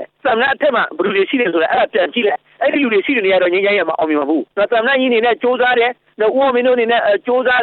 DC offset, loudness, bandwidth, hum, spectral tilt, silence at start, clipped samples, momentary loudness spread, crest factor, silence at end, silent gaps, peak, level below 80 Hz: under 0.1%; -15 LUFS; 4.4 kHz; none; -7.5 dB/octave; 0 s; under 0.1%; 4 LU; 12 dB; 0 s; none; -4 dBFS; -58 dBFS